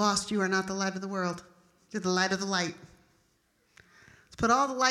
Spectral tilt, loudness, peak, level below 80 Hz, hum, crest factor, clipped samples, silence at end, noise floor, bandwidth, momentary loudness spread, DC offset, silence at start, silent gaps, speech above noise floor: -3.5 dB/octave; -29 LUFS; -10 dBFS; -62 dBFS; none; 22 dB; under 0.1%; 0 s; -71 dBFS; 13 kHz; 10 LU; under 0.1%; 0 s; none; 42 dB